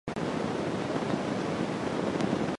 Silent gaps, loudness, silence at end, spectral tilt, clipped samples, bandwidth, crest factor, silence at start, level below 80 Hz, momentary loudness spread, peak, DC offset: none; -31 LUFS; 0 s; -6 dB/octave; under 0.1%; 11.5 kHz; 16 dB; 0.05 s; -56 dBFS; 2 LU; -16 dBFS; under 0.1%